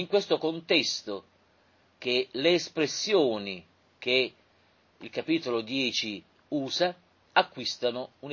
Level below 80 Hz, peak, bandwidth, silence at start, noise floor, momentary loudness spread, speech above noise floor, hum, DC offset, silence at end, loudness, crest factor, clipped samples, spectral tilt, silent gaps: -74 dBFS; -6 dBFS; 7.4 kHz; 0 s; -65 dBFS; 13 LU; 36 dB; none; under 0.1%; 0 s; -28 LUFS; 24 dB; under 0.1%; -3.5 dB/octave; none